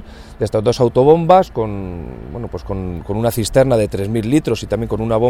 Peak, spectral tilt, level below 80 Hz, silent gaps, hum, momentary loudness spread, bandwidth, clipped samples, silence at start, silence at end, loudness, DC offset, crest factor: 0 dBFS; -6.5 dB/octave; -34 dBFS; none; none; 16 LU; 17.5 kHz; under 0.1%; 0 s; 0 s; -16 LUFS; under 0.1%; 16 dB